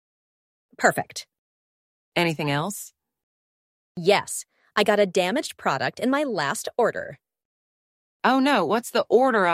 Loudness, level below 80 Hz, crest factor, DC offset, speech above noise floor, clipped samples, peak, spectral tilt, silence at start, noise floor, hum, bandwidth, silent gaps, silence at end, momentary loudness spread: -23 LUFS; -70 dBFS; 22 dB; under 0.1%; over 67 dB; under 0.1%; -2 dBFS; -4 dB/octave; 0.8 s; under -90 dBFS; none; 16 kHz; 1.38-2.12 s, 3.23-3.95 s, 7.45-8.20 s; 0 s; 14 LU